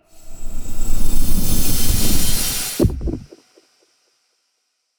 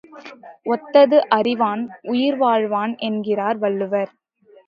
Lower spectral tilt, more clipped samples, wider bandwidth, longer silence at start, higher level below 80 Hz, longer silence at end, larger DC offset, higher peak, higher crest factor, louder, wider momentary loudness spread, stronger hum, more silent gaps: second, -3.5 dB/octave vs -7.5 dB/octave; neither; first, over 20 kHz vs 5.6 kHz; about the same, 0.25 s vs 0.15 s; first, -20 dBFS vs -74 dBFS; first, 1.8 s vs 0.6 s; neither; about the same, -4 dBFS vs -2 dBFS; second, 12 dB vs 18 dB; about the same, -21 LUFS vs -19 LUFS; about the same, 15 LU vs 16 LU; neither; neither